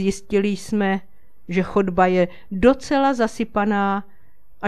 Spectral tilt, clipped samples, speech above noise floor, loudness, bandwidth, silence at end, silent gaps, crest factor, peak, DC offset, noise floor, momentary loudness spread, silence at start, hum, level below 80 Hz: -6.5 dB/octave; under 0.1%; 37 dB; -21 LUFS; 12.5 kHz; 0 s; none; 20 dB; 0 dBFS; 2%; -57 dBFS; 6 LU; 0 s; none; -44 dBFS